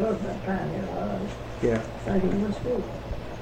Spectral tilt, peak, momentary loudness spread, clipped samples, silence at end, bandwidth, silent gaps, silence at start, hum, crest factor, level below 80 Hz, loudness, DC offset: -7.5 dB/octave; -12 dBFS; 9 LU; under 0.1%; 0 s; 14.5 kHz; none; 0 s; none; 16 dB; -42 dBFS; -29 LUFS; under 0.1%